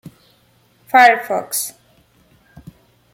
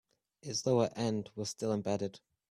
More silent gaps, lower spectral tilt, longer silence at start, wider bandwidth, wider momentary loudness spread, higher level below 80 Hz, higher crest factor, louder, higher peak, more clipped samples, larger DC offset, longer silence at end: neither; second, -1.5 dB/octave vs -5 dB/octave; first, 0.95 s vs 0.45 s; first, 17 kHz vs 14.5 kHz; about the same, 12 LU vs 10 LU; first, -60 dBFS vs -70 dBFS; about the same, 18 dB vs 18 dB; first, -15 LUFS vs -35 LUFS; first, -2 dBFS vs -18 dBFS; neither; neither; first, 1.45 s vs 0.35 s